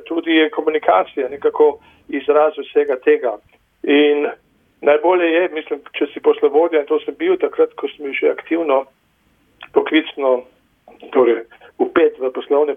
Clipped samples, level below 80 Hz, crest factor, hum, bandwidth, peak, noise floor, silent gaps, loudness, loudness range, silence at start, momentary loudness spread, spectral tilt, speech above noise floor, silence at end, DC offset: under 0.1%; -64 dBFS; 16 dB; none; 3.7 kHz; -2 dBFS; -59 dBFS; none; -17 LUFS; 3 LU; 0.05 s; 9 LU; -6.5 dB/octave; 43 dB; 0 s; under 0.1%